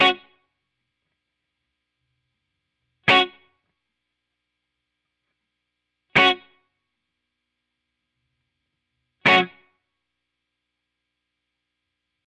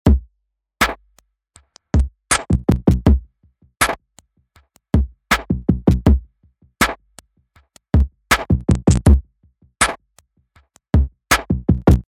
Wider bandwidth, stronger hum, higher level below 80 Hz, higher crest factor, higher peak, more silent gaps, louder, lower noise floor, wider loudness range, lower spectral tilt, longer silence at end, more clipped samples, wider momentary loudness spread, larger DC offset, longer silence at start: second, 10.5 kHz vs 16 kHz; first, 60 Hz at -65 dBFS vs none; second, -68 dBFS vs -22 dBFS; about the same, 22 dB vs 18 dB; second, -6 dBFS vs 0 dBFS; neither; about the same, -19 LUFS vs -18 LUFS; first, -81 dBFS vs -72 dBFS; about the same, 0 LU vs 1 LU; about the same, -4 dB/octave vs -5 dB/octave; first, 2.8 s vs 0.1 s; neither; first, 12 LU vs 6 LU; neither; about the same, 0 s vs 0.05 s